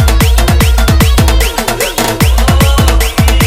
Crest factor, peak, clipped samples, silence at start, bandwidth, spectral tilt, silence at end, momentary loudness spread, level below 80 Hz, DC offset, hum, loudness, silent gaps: 8 dB; 0 dBFS; 0.1%; 0 s; 16.5 kHz; -4.5 dB/octave; 0 s; 4 LU; -10 dBFS; under 0.1%; none; -9 LUFS; none